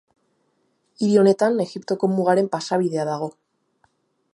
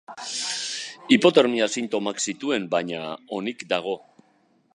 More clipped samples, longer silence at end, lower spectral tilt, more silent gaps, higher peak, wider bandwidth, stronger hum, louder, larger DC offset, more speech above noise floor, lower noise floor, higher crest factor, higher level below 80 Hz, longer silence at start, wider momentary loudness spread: neither; first, 1.05 s vs 0.8 s; first, -6.5 dB/octave vs -3 dB/octave; neither; about the same, -4 dBFS vs -2 dBFS; about the same, 11.5 kHz vs 11 kHz; neither; first, -21 LUFS vs -24 LUFS; neither; first, 48 dB vs 40 dB; first, -68 dBFS vs -63 dBFS; about the same, 18 dB vs 22 dB; about the same, -74 dBFS vs -74 dBFS; first, 1 s vs 0.1 s; second, 10 LU vs 14 LU